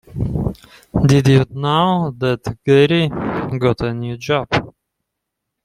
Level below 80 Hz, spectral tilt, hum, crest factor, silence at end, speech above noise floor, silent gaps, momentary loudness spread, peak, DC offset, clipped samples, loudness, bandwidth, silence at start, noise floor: -38 dBFS; -7 dB/octave; none; 16 dB; 0.95 s; 63 dB; none; 11 LU; 0 dBFS; under 0.1%; under 0.1%; -17 LUFS; 11.5 kHz; 0.1 s; -78 dBFS